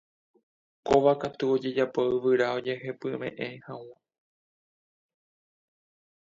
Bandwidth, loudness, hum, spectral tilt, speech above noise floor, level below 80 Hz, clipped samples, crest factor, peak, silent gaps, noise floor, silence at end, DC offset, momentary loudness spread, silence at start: 7.8 kHz; -27 LUFS; none; -6.5 dB/octave; over 63 dB; -64 dBFS; under 0.1%; 22 dB; -8 dBFS; none; under -90 dBFS; 2.45 s; under 0.1%; 17 LU; 0.85 s